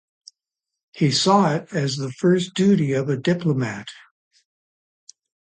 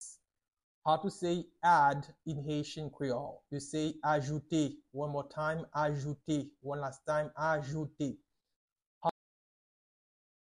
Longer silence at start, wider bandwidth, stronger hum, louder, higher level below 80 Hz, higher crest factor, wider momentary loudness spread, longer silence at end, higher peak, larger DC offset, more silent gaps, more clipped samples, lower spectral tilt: first, 0.95 s vs 0 s; second, 9.6 kHz vs 11.5 kHz; neither; first, -20 LUFS vs -35 LUFS; about the same, -64 dBFS vs -68 dBFS; about the same, 18 dB vs 20 dB; about the same, 9 LU vs 10 LU; first, 1.6 s vs 1.3 s; first, -4 dBFS vs -16 dBFS; neither; second, none vs 0.63-0.82 s, 8.56-8.76 s, 8.87-9.01 s; neither; about the same, -5.5 dB/octave vs -6 dB/octave